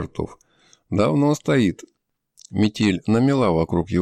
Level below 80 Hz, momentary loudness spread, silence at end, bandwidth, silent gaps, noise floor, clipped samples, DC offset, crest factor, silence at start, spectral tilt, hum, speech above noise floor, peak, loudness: -46 dBFS; 12 LU; 0 s; 13 kHz; none; -57 dBFS; under 0.1%; under 0.1%; 14 dB; 0 s; -7 dB/octave; none; 37 dB; -6 dBFS; -20 LUFS